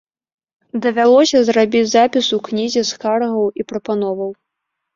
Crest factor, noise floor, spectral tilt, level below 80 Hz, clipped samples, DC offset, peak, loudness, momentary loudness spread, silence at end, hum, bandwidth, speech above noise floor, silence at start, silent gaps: 14 dB; -77 dBFS; -4 dB/octave; -60 dBFS; under 0.1%; under 0.1%; -2 dBFS; -16 LUFS; 11 LU; 0.65 s; none; 7.6 kHz; 62 dB; 0.75 s; none